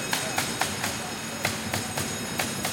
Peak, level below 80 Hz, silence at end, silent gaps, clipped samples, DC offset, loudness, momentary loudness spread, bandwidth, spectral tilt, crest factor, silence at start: -10 dBFS; -56 dBFS; 0 s; none; under 0.1%; under 0.1%; -28 LUFS; 3 LU; 17 kHz; -2.5 dB/octave; 20 dB; 0 s